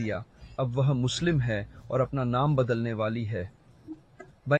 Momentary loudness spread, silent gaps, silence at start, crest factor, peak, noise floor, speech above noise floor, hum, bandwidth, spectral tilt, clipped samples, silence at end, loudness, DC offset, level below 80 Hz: 18 LU; none; 0 s; 16 dB; -12 dBFS; -52 dBFS; 25 dB; none; 9.2 kHz; -6.5 dB/octave; under 0.1%; 0 s; -28 LUFS; under 0.1%; -52 dBFS